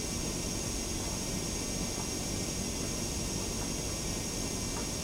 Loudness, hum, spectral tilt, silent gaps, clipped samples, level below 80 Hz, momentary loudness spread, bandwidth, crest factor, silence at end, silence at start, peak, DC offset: -34 LUFS; none; -3 dB/octave; none; under 0.1%; -44 dBFS; 0 LU; 16 kHz; 14 dB; 0 s; 0 s; -22 dBFS; under 0.1%